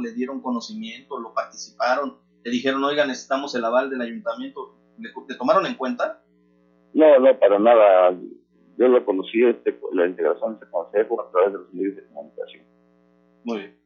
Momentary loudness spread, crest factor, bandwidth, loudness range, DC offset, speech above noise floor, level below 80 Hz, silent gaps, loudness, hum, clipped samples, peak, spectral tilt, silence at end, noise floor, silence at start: 22 LU; 18 dB; 7.2 kHz; 9 LU; under 0.1%; 39 dB; -78 dBFS; none; -21 LUFS; 60 Hz at -60 dBFS; under 0.1%; -4 dBFS; -4.5 dB/octave; 0.2 s; -60 dBFS; 0 s